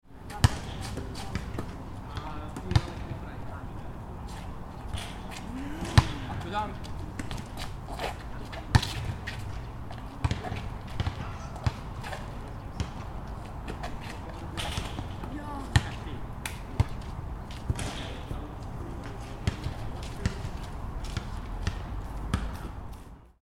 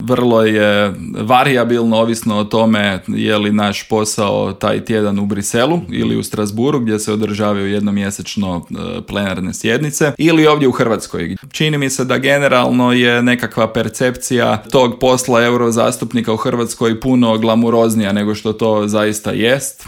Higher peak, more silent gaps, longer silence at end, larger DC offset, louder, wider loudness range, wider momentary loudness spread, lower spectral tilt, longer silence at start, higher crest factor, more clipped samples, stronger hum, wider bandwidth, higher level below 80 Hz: about the same, -2 dBFS vs 0 dBFS; neither; about the same, 0.1 s vs 0.05 s; neither; second, -35 LUFS vs -14 LUFS; about the same, 5 LU vs 4 LU; first, 12 LU vs 7 LU; about the same, -5.5 dB/octave vs -5 dB/octave; about the same, 0.05 s vs 0 s; first, 32 dB vs 14 dB; neither; neither; about the same, 16.5 kHz vs 17 kHz; first, -38 dBFS vs -46 dBFS